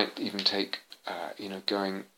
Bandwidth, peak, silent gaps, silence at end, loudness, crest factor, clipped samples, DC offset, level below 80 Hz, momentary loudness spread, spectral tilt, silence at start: 17 kHz; -8 dBFS; none; 0.1 s; -31 LUFS; 24 dB; under 0.1%; under 0.1%; -86 dBFS; 11 LU; -4 dB/octave; 0 s